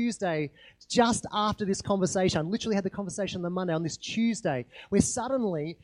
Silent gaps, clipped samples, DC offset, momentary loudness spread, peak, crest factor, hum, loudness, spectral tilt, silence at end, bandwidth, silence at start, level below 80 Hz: none; under 0.1%; under 0.1%; 7 LU; -8 dBFS; 20 dB; none; -29 LUFS; -4.5 dB/octave; 0.1 s; 11.5 kHz; 0 s; -56 dBFS